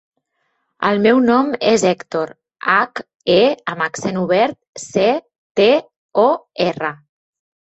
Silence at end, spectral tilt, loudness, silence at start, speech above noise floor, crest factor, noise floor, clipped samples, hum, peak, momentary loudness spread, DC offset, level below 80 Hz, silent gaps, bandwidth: 0.7 s; -4.5 dB/octave; -17 LUFS; 0.8 s; 53 dB; 16 dB; -69 dBFS; under 0.1%; none; -2 dBFS; 11 LU; under 0.1%; -60 dBFS; 3.15-3.20 s, 4.69-4.73 s, 5.38-5.55 s, 5.96-6.09 s; 8.4 kHz